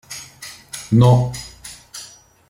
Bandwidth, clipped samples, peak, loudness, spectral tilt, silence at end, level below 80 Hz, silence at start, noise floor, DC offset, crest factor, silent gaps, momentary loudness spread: 15 kHz; under 0.1%; -2 dBFS; -15 LUFS; -6.5 dB/octave; 0.45 s; -48 dBFS; 0.1 s; -43 dBFS; under 0.1%; 18 dB; none; 23 LU